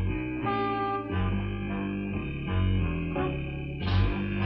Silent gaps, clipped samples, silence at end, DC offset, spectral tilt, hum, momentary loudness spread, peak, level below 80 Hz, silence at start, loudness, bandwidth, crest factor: none; under 0.1%; 0 s; under 0.1%; -9.5 dB/octave; none; 6 LU; -14 dBFS; -36 dBFS; 0 s; -30 LUFS; 5.6 kHz; 14 dB